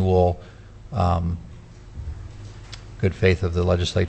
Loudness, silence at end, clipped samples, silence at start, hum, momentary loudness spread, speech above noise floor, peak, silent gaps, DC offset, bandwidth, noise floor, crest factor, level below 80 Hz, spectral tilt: -23 LUFS; 0 s; under 0.1%; 0 s; none; 21 LU; 20 dB; -4 dBFS; none; under 0.1%; 8.6 kHz; -41 dBFS; 18 dB; -38 dBFS; -7 dB/octave